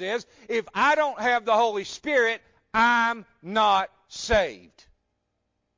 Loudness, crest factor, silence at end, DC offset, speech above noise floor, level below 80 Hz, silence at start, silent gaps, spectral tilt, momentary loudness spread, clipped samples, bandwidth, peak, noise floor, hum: -24 LUFS; 16 dB; 1.2 s; under 0.1%; 53 dB; -50 dBFS; 0 s; none; -3 dB/octave; 11 LU; under 0.1%; 7.6 kHz; -10 dBFS; -77 dBFS; none